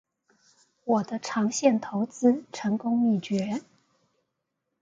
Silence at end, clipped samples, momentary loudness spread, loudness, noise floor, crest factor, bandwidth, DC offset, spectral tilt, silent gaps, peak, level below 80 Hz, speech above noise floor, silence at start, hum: 1.2 s; under 0.1%; 7 LU; -26 LUFS; -81 dBFS; 20 dB; 9.2 kHz; under 0.1%; -5.5 dB/octave; none; -8 dBFS; -72 dBFS; 56 dB; 0.85 s; none